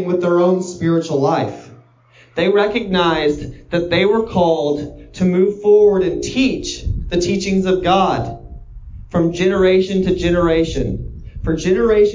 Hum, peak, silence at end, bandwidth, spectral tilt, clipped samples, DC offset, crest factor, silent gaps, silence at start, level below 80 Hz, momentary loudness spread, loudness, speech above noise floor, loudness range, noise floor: none; -2 dBFS; 0 s; 7.6 kHz; -6 dB/octave; under 0.1%; under 0.1%; 14 dB; none; 0 s; -34 dBFS; 11 LU; -16 LUFS; 34 dB; 3 LU; -49 dBFS